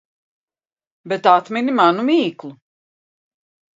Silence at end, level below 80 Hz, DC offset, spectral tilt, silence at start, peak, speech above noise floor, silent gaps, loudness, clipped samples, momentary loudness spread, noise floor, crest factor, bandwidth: 1.25 s; -74 dBFS; under 0.1%; -6 dB/octave; 1.05 s; 0 dBFS; over 73 dB; none; -17 LUFS; under 0.1%; 16 LU; under -90 dBFS; 20 dB; 7.8 kHz